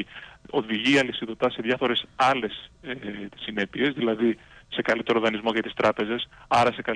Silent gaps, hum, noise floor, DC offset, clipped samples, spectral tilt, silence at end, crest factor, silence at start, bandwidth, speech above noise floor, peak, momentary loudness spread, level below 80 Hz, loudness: none; none; -45 dBFS; under 0.1%; under 0.1%; -5 dB/octave; 0 s; 16 dB; 0 s; 10.5 kHz; 20 dB; -10 dBFS; 13 LU; -58 dBFS; -25 LUFS